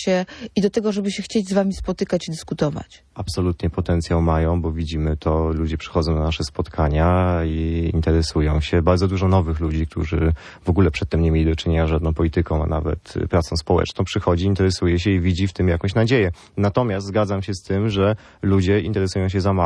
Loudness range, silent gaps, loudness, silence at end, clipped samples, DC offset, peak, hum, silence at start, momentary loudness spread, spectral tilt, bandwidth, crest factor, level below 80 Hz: 3 LU; none; -21 LUFS; 0 s; under 0.1%; under 0.1%; -2 dBFS; none; 0 s; 6 LU; -7 dB/octave; 11 kHz; 16 dB; -30 dBFS